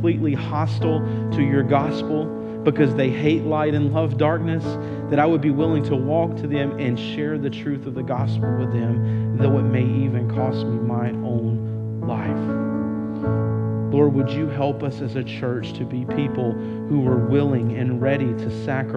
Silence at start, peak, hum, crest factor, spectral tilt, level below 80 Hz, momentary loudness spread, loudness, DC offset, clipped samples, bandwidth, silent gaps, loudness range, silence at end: 0 s; -4 dBFS; none; 18 dB; -9.5 dB/octave; -52 dBFS; 7 LU; -22 LUFS; under 0.1%; under 0.1%; 6.4 kHz; none; 3 LU; 0 s